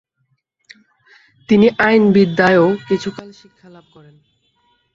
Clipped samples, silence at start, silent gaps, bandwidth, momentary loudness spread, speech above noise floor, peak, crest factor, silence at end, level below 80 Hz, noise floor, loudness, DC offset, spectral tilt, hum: under 0.1%; 1.5 s; none; 7.4 kHz; 10 LU; 52 dB; 0 dBFS; 16 dB; 1.65 s; -54 dBFS; -67 dBFS; -13 LUFS; under 0.1%; -7 dB/octave; none